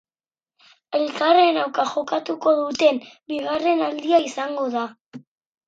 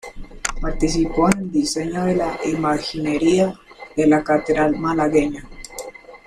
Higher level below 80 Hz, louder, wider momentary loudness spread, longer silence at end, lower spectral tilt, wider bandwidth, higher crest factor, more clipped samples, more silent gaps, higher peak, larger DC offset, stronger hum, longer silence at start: second, -70 dBFS vs -34 dBFS; about the same, -21 LUFS vs -20 LUFS; second, 12 LU vs 17 LU; first, 0.5 s vs 0.1 s; second, -3.5 dB/octave vs -5 dB/octave; second, 8 kHz vs 13.5 kHz; about the same, 18 dB vs 18 dB; neither; first, 5.01-5.11 s vs none; about the same, -4 dBFS vs -2 dBFS; neither; neither; first, 0.9 s vs 0.05 s